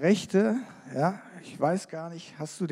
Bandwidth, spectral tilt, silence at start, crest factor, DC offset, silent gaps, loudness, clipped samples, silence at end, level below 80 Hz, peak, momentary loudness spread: 13 kHz; -6 dB/octave; 0 s; 18 dB; under 0.1%; none; -29 LUFS; under 0.1%; 0 s; -76 dBFS; -10 dBFS; 16 LU